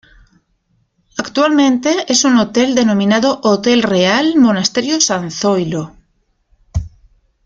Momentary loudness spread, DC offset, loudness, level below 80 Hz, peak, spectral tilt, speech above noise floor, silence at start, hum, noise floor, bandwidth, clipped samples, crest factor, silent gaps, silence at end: 13 LU; under 0.1%; -13 LUFS; -40 dBFS; 0 dBFS; -4 dB/octave; 48 dB; 1.15 s; none; -61 dBFS; 9.2 kHz; under 0.1%; 14 dB; none; 0.6 s